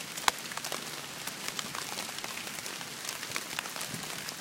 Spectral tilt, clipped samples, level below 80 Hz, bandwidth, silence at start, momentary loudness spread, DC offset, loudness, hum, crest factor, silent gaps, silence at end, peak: -1 dB/octave; under 0.1%; -72 dBFS; 17 kHz; 0 s; 7 LU; under 0.1%; -36 LUFS; none; 34 dB; none; 0 s; -4 dBFS